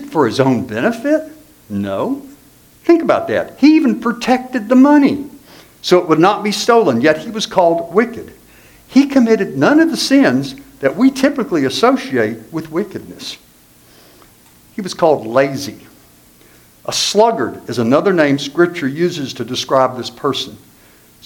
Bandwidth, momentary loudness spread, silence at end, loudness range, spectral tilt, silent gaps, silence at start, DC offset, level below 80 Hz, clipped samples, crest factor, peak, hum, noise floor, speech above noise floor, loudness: 18.5 kHz; 14 LU; 0.7 s; 7 LU; -5 dB/octave; none; 0 s; under 0.1%; -54 dBFS; under 0.1%; 16 dB; 0 dBFS; none; -47 dBFS; 33 dB; -14 LUFS